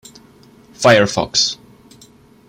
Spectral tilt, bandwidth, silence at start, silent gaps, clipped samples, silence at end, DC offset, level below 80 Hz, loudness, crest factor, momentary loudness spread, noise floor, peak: -3 dB/octave; 15.5 kHz; 0.8 s; none; under 0.1%; 0.95 s; under 0.1%; -52 dBFS; -14 LUFS; 18 dB; 7 LU; -47 dBFS; 0 dBFS